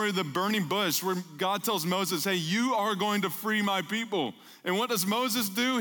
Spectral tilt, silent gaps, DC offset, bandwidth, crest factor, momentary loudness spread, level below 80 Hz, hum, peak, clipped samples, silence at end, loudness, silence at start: -3.5 dB/octave; none; under 0.1%; 19.5 kHz; 14 dB; 4 LU; -82 dBFS; none; -14 dBFS; under 0.1%; 0 s; -28 LUFS; 0 s